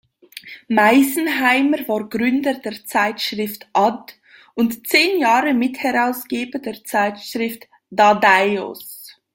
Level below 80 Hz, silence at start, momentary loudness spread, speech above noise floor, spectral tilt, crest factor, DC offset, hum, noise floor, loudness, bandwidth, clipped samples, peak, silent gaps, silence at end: -64 dBFS; 0.35 s; 18 LU; 22 dB; -3.5 dB/octave; 18 dB; under 0.1%; none; -40 dBFS; -18 LUFS; 17 kHz; under 0.1%; -2 dBFS; none; 0.25 s